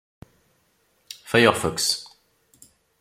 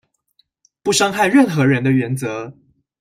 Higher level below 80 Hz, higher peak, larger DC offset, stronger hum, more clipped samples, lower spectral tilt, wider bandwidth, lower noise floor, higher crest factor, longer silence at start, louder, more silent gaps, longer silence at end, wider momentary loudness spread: about the same, -58 dBFS vs -58 dBFS; about the same, 0 dBFS vs -2 dBFS; neither; neither; neither; second, -3 dB/octave vs -5 dB/octave; about the same, 16.5 kHz vs 16 kHz; about the same, -66 dBFS vs -63 dBFS; first, 26 dB vs 16 dB; first, 1.25 s vs 0.85 s; second, -21 LUFS vs -16 LUFS; neither; first, 0.95 s vs 0.5 s; first, 22 LU vs 13 LU